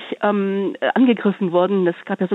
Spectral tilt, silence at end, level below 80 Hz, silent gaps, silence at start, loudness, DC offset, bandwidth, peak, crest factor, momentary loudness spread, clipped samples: -9 dB/octave; 0 s; -74 dBFS; none; 0 s; -19 LUFS; under 0.1%; 4.1 kHz; -4 dBFS; 14 dB; 6 LU; under 0.1%